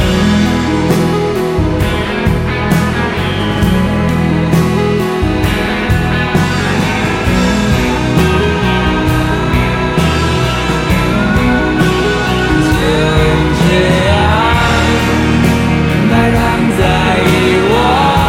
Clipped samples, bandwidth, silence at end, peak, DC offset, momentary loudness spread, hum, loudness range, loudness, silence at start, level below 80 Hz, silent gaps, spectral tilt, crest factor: under 0.1%; 16.5 kHz; 0 s; 0 dBFS; under 0.1%; 4 LU; none; 2 LU; -12 LUFS; 0 s; -22 dBFS; none; -6 dB/octave; 12 dB